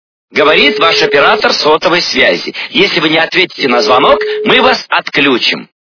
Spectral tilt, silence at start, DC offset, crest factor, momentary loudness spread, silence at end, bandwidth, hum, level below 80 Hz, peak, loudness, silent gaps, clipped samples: -3.5 dB/octave; 0.35 s; under 0.1%; 10 dB; 5 LU; 0.35 s; 5.4 kHz; none; -46 dBFS; 0 dBFS; -9 LUFS; none; 0.9%